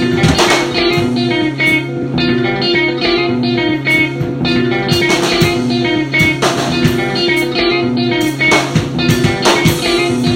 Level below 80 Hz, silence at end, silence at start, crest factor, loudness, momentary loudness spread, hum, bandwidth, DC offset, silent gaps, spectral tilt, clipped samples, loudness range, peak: -36 dBFS; 0 s; 0 s; 12 dB; -12 LUFS; 4 LU; none; 16.5 kHz; under 0.1%; none; -4.5 dB/octave; under 0.1%; 1 LU; 0 dBFS